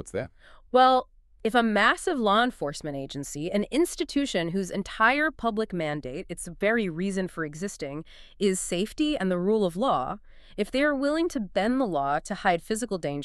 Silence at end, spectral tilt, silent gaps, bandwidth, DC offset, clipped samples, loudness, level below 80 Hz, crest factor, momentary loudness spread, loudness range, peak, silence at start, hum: 0 s; -4.5 dB/octave; none; 13.5 kHz; under 0.1%; under 0.1%; -26 LUFS; -50 dBFS; 20 dB; 13 LU; 4 LU; -6 dBFS; 0 s; none